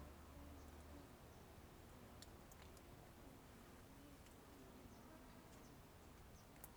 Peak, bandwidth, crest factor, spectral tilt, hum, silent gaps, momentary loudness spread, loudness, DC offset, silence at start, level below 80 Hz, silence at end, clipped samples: -38 dBFS; over 20 kHz; 22 dB; -5 dB/octave; none; none; 3 LU; -62 LUFS; under 0.1%; 0 s; -68 dBFS; 0 s; under 0.1%